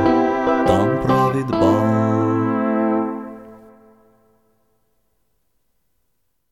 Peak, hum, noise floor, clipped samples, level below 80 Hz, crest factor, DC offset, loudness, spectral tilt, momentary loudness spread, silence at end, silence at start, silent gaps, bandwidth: -4 dBFS; none; -72 dBFS; under 0.1%; -46 dBFS; 16 dB; under 0.1%; -18 LUFS; -8 dB/octave; 9 LU; 2.95 s; 0 s; none; 13 kHz